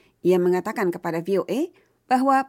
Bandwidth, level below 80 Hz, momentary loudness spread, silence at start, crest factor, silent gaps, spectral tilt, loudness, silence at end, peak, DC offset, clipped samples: 16.5 kHz; -72 dBFS; 8 LU; 0.25 s; 14 dB; none; -6.5 dB/octave; -23 LUFS; 0 s; -8 dBFS; under 0.1%; under 0.1%